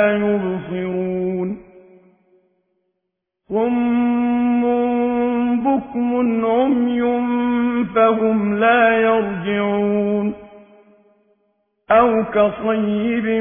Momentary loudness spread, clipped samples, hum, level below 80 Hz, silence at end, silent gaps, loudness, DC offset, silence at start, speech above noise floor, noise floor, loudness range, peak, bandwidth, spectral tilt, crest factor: 8 LU; under 0.1%; none; -54 dBFS; 0 s; none; -18 LUFS; under 0.1%; 0 s; 60 dB; -77 dBFS; 7 LU; -2 dBFS; 3.6 kHz; -11 dB/octave; 16 dB